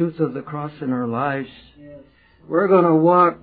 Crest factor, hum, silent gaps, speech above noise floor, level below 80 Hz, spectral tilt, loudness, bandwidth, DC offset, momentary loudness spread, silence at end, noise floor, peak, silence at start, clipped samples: 18 dB; none; none; 30 dB; -60 dBFS; -12.5 dB/octave; -19 LUFS; 4.7 kHz; under 0.1%; 15 LU; 0.05 s; -48 dBFS; -2 dBFS; 0 s; under 0.1%